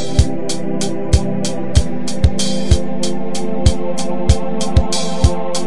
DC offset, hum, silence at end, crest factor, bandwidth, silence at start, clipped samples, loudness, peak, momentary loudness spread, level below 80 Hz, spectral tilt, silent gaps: 20%; none; 0 s; 18 dB; 11.5 kHz; 0 s; under 0.1%; -18 LUFS; 0 dBFS; 5 LU; -22 dBFS; -5.5 dB/octave; none